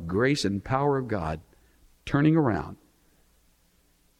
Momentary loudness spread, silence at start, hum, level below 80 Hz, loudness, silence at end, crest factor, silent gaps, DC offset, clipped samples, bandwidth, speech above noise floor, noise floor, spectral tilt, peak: 15 LU; 0 s; none; -50 dBFS; -26 LUFS; 1.45 s; 18 dB; none; under 0.1%; under 0.1%; 12 kHz; 40 dB; -65 dBFS; -6.5 dB/octave; -10 dBFS